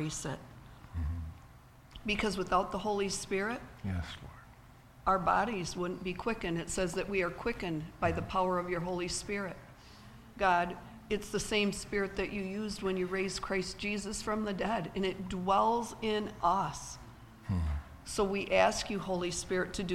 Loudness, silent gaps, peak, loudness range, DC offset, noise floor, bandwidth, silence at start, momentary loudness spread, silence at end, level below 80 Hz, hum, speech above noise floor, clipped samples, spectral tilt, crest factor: -34 LUFS; none; -12 dBFS; 2 LU; under 0.1%; -56 dBFS; 16.5 kHz; 0 s; 15 LU; 0 s; -50 dBFS; none; 23 dB; under 0.1%; -4.5 dB/octave; 22 dB